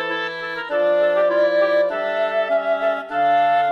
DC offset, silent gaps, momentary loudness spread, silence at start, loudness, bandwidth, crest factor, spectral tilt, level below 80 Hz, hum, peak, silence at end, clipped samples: under 0.1%; none; 7 LU; 0 s; -19 LUFS; 6.6 kHz; 10 dB; -5 dB/octave; -66 dBFS; none; -8 dBFS; 0 s; under 0.1%